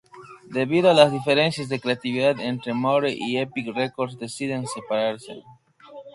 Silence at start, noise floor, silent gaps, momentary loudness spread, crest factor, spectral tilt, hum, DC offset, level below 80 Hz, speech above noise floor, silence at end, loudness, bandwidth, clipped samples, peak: 0.15 s; -44 dBFS; none; 12 LU; 22 dB; -5 dB/octave; none; under 0.1%; -66 dBFS; 22 dB; 0.05 s; -23 LUFS; 11.5 kHz; under 0.1%; 0 dBFS